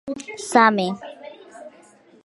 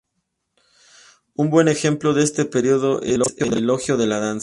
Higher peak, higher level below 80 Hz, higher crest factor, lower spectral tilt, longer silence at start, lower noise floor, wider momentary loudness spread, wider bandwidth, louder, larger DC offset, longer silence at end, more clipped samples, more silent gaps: about the same, 0 dBFS vs -2 dBFS; second, -68 dBFS vs -54 dBFS; about the same, 22 dB vs 18 dB; about the same, -4 dB/octave vs -5 dB/octave; second, 0.05 s vs 1.4 s; second, -51 dBFS vs -75 dBFS; first, 25 LU vs 5 LU; about the same, 12 kHz vs 11.5 kHz; about the same, -19 LUFS vs -19 LUFS; neither; first, 0.55 s vs 0 s; neither; neither